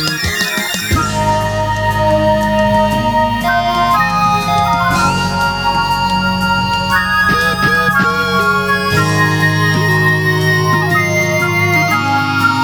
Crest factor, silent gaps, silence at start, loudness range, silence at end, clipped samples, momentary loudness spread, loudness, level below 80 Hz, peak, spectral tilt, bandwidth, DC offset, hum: 12 dB; none; 0 s; 1 LU; 0 s; under 0.1%; 3 LU; -13 LUFS; -32 dBFS; 0 dBFS; -4.5 dB/octave; over 20 kHz; under 0.1%; none